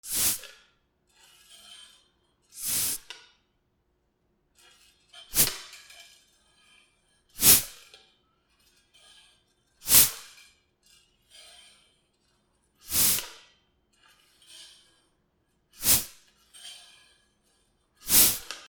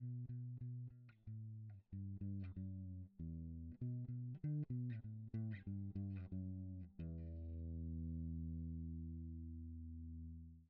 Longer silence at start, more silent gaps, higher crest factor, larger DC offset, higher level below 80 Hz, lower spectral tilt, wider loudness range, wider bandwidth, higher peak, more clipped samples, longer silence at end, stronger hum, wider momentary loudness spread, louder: about the same, 0.05 s vs 0 s; neither; first, 30 dB vs 12 dB; neither; about the same, -56 dBFS vs -58 dBFS; second, 0 dB/octave vs -11.5 dB/octave; first, 10 LU vs 4 LU; first, over 20 kHz vs 4 kHz; first, -2 dBFS vs -36 dBFS; neither; about the same, 0.1 s vs 0 s; neither; first, 28 LU vs 7 LU; first, -21 LUFS vs -50 LUFS